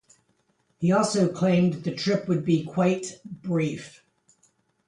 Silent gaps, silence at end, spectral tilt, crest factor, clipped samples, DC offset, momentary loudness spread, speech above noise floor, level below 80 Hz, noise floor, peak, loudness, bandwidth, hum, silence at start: none; 1 s; -6.5 dB/octave; 16 dB; under 0.1%; under 0.1%; 13 LU; 45 dB; -66 dBFS; -69 dBFS; -10 dBFS; -25 LUFS; 11 kHz; none; 0.8 s